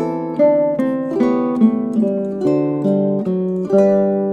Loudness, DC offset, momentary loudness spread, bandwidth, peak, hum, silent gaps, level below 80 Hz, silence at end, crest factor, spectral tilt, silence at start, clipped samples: -17 LUFS; under 0.1%; 5 LU; 7.8 kHz; -2 dBFS; none; none; -58 dBFS; 0 s; 14 dB; -10 dB/octave; 0 s; under 0.1%